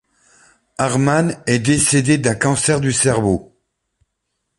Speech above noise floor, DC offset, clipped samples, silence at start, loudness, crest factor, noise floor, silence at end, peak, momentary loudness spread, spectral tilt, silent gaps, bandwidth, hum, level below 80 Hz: 58 dB; under 0.1%; under 0.1%; 0.8 s; -16 LUFS; 18 dB; -74 dBFS; 1.15 s; 0 dBFS; 7 LU; -4.5 dB/octave; none; 11.5 kHz; none; -44 dBFS